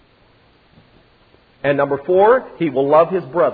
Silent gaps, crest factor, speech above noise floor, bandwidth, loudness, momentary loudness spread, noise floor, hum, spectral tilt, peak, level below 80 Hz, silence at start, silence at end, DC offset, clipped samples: none; 16 dB; 38 dB; 4.9 kHz; -16 LUFS; 7 LU; -53 dBFS; none; -10.5 dB/octave; 0 dBFS; -56 dBFS; 1.65 s; 0 s; under 0.1%; under 0.1%